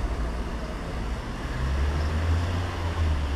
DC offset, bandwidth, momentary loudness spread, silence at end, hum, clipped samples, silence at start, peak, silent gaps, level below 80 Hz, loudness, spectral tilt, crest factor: under 0.1%; 12 kHz; 7 LU; 0 s; none; under 0.1%; 0 s; -16 dBFS; none; -30 dBFS; -29 LUFS; -6.5 dB/octave; 12 dB